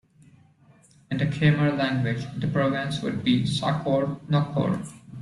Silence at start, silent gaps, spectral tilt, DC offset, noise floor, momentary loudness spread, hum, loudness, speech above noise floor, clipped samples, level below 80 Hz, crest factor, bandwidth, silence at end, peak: 1.1 s; none; -7 dB/octave; under 0.1%; -57 dBFS; 7 LU; none; -25 LUFS; 32 dB; under 0.1%; -56 dBFS; 18 dB; 11.5 kHz; 0 s; -8 dBFS